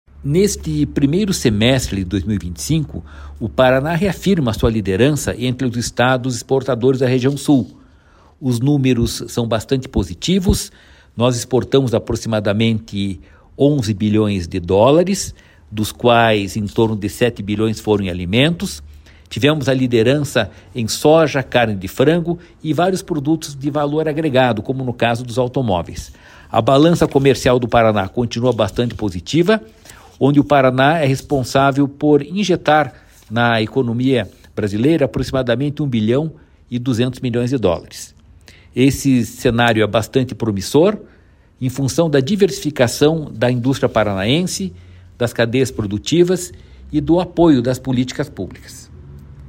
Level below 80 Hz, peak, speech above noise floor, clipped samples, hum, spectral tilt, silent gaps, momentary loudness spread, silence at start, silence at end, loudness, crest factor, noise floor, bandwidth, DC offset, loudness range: -38 dBFS; 0 dBFS; 32 dB; under 0.1%; none; -5.5 dB/octave; none; 10 LU; 0.15 s; 0 s; -17 LUFS; 16 dB; -48 dBFS; 16.5 kHz; under 0.1%; 3 LU